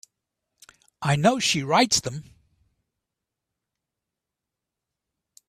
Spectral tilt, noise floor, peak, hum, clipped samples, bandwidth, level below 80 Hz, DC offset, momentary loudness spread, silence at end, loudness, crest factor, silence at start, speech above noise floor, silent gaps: -3.5 dB/octave; -86 dBFS; -6 dBFS; none; under 0.1%; 15.5 kHz; -62 dBFS; under 0.1%; 14 LU; 3.25 s; -22 LUFS; 22 dB; 1 s; 64 dB; none